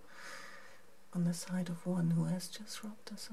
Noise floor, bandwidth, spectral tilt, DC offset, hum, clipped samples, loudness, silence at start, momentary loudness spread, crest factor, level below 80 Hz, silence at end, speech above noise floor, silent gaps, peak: -61 dBFS; 14.5 kHz; -6 dB/octave; 0.3%; none; under 0.1%; -38 LUFS; 0.05 s; 17 LU; 14 dB; -78 dBFS; 0 s; 24 dB; none; -24 dBFS